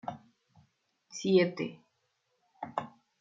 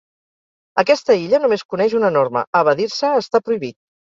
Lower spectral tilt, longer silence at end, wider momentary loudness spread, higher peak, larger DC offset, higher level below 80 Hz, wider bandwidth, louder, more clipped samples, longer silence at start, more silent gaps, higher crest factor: about the same, -5.5 dB/octave vs -5 dB/octave; second, 0.3 s vs 0.45 s; first, 21 LU vs 7 LU; second, -14 dBFS vs -2 dBFS; neither; second, -78 dBFS vs -64 dBFS; about the same, 7.6 kHz vs 7.6 kHz; second, -31 LUFS vs -17 LUFS; neither; second, 0.05 s vs 0.75 s; second, none vs 1.65-1.69 s, 2.47-2.53 s; first, 22 dB vs 16 dB